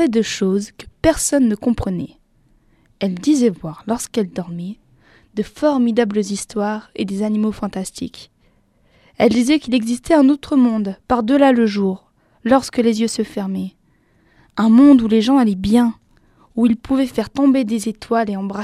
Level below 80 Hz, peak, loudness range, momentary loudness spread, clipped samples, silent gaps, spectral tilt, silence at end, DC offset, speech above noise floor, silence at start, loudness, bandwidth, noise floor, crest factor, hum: -44 dBFS; 0 dBFS; 6 LU; 13 LU; under 0.1%; none; -5.5 dB/octave; 0 s; under 0.1%; 41 dB; 0 s; -17 LUFS; 14 kHz; -57 dBFS; 18 dB; none